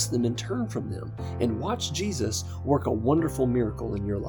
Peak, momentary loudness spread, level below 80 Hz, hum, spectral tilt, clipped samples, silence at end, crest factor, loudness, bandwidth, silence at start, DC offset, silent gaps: -10 dBFS; 7 LU; -46 dBFS; none; -5.5 dB/octave; under 0.1%; 0 s; 16 dB; -28 LUFS; over 20 kHz; 0 s; under 0.1%; none